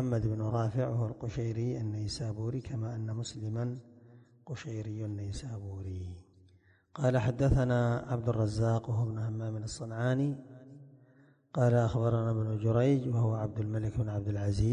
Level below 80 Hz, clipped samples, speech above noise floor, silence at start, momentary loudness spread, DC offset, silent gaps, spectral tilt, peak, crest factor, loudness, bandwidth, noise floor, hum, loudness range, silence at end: -48 dBFS; under 0.1%; 32 dB; 0 s; 13 LU; under 0.1%; none; -7.5 dB/octave; -14 dBFS; 18 dB; -33 LUFS; 9.8 kHz; -64 dBFS; none; 9 LU; 0 s